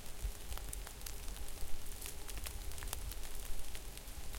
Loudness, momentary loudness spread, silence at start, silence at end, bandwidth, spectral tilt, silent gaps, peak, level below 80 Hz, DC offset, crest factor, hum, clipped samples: -47 LUFS; 4 LU; 0 s; 0 s; 17 kHz; -2.5 dB/octave; none; -18 dBFS; -46 dBFS; under 0.1%; 22 dB; none; under 0.1%